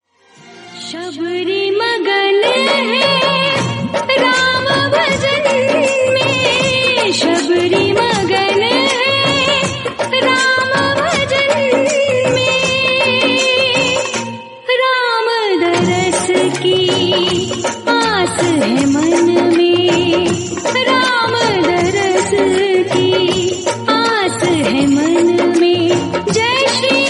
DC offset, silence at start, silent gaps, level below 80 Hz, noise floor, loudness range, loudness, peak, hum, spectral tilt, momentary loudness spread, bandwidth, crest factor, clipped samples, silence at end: under 0.1%; 0.45 s; none; -50 dBFS; -44 dBFS; 1 LU; -13 LUFS; 0 dBFS; none; -3.5 dB/octave; 5 LU; 11.5 kHz; 14 dB; under 0.1%; 0 s